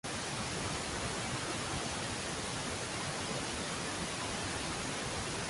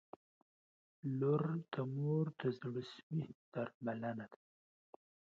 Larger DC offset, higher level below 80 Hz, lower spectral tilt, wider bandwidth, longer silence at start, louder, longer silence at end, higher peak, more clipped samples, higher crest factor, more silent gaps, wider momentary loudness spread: neither; first, -54 dBFS vs -84 dBFS; second, -3 dB/octave vs -7.5 dB/octave; first, 12 kHz vs 7 kHz; second, 0.05 s vs 1.05 s; first, -37 LUFS vs -41 LUFS; second, 0 s vs 0.95 s; about the same, -24 dBFS vs -24 dBFS; neither; about the same, 14 dB vs 18 dB; second, none vs 3.03-3.10 s, 3.34-3.52 s, 3.74-3.81 s; second, 1 LU vs 11 LU